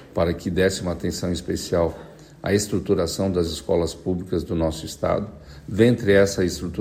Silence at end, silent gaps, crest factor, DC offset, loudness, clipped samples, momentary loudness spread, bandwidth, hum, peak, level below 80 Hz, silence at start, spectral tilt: 0 s; none; 20 dB; under 0.1%; -23 LUFS; under 0.1%; 9 LU; 16 kHz; none; -4 dBFS; -44 dBFS; 0 s; -5.5 dB/octave